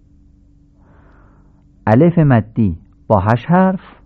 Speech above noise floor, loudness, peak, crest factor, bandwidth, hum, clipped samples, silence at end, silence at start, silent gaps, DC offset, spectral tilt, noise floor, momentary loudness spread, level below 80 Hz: 36 dB; -14 LUFS; 0 dBFS; 16 dB; 5.2 kHz; none; under 0.1%; 0.25 s; 1.85 s; none; under 0.1%; -10.5 dB/octave; -48 dBFS; 9 LU; -38 dBFS